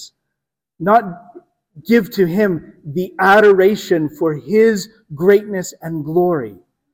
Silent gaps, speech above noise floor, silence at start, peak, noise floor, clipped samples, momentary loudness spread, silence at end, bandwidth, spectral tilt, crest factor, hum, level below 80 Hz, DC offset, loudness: none; 66 dB; 0 s; 0 dBFS; -81 dBFS; under 0.1%; 15 LU; 0.4 s; 16.5 kHz; -6 dB/octave; 16 dB; none; -56 dBFS; under 0.1%; -15 LUFS